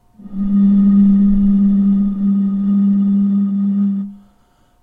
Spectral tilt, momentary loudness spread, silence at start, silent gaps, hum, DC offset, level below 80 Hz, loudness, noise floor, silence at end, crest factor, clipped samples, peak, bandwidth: -12.5 dB/octave; 8 LU; 0.25 s; none; none; under 0.1%; -34 dBFS; -14 LUFS; -54 dBFS; 0.65 s; 10 dB; under 0.1%; -4 dBFS; 2 kHz